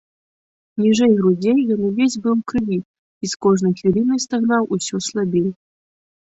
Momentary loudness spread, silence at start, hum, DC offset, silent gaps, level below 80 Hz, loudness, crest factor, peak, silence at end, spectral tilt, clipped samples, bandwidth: 9 LU; 0.75 s; none; under 0.1%; 2.85-3.21 s; -54 dBFS; -18 LUFS; 14 dB; -4 dBFS; 0.8 s; -5.5 dB/octave; under 0.1%; 8.2 kHz